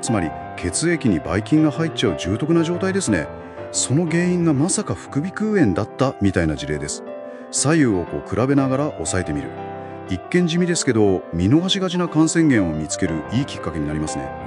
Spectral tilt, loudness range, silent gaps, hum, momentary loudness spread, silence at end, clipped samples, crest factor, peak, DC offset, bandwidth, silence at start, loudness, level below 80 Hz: -5 dB/octave; 3 LU; none; none; 10 LU; 0 s; under 0.1%; 16 dB; -4 dBFS; under 0.1%; 11.5 kHz; 0 s; -20 LUFS; -44 dBFS